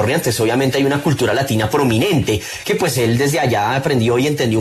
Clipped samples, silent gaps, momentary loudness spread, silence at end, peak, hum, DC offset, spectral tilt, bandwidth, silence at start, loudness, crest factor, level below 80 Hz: under 0.1%; none; 2 LU; 0 s; -2 dBFS; none; under 0.1%; -5 dB/octave; 13.5 kHz; 0 s; -16 LUFS; 12 dB; -44 dBFS